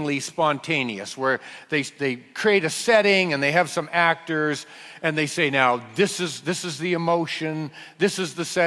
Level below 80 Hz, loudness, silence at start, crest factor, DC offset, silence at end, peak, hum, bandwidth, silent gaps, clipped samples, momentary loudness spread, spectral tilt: -68 dBFS; -23 LUFS; 0 s; 20 dB; under 0.1%; 0 s; -4 dBFS; none; 12 kHz; none; under 0.1%; 9 LU; -4 dB/octave